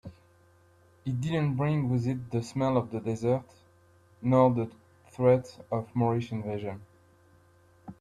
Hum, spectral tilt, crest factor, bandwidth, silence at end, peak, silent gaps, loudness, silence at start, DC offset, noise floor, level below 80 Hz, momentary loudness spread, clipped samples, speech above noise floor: none; -8.5 dB/octave; 20 dB; 10.5 kHz; 0.1 s; -10 dBFS; none; -29 LUFS; 0.05 s; under 0.1%; -61 dBFS; -62 dBFS; 14 LU; under 0.1%; 33 dB